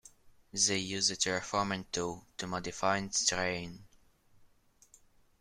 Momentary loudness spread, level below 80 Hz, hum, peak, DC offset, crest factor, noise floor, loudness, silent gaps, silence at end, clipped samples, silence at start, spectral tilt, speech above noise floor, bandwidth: 11 LU; -62 dBFS; none; -12 dBFS; under 0.1%; 24 dB; -65 dBFS; -32 LUFS; none; 0.95 s; under 0.1%; 0.05 s; -2 dB/octave; 31 dB; 14.5 kHz